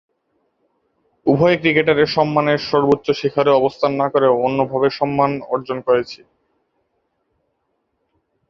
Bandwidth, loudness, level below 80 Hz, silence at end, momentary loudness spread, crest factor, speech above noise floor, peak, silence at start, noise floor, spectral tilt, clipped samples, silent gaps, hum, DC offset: 7 kHz; -17 LUFS; -54 dBFS; 2.35 s; 7 LU; 18 dB; 54 dB; -2 dBFS; 1.25 s; -70 dBFS; -7 dB/octave; under 0.1%; none; none; under 0.1%